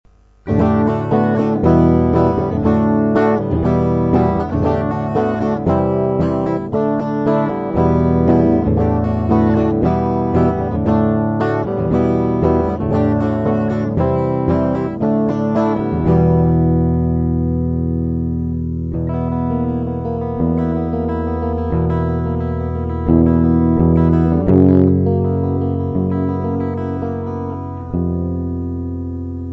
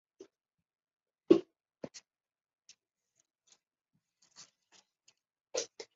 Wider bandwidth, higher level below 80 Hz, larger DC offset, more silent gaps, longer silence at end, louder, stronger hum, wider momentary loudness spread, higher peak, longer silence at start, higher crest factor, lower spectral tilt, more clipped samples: second, 6 kHz vs 7.6 kHz; first, -30 dBFS vs -84 dBFS; neither; neither; second, 0 s vs 0.15 s; first, -17 LUFS vs -32 LUFS; neither; second, 8 LU vs 28 LU; first, -2 dBFS vs -10 dBFS; second, 0.45 s vs 1.3 s; second, 14 dB vs 30 dB; first, -11 dB/octave vs -5 dB/octave; neither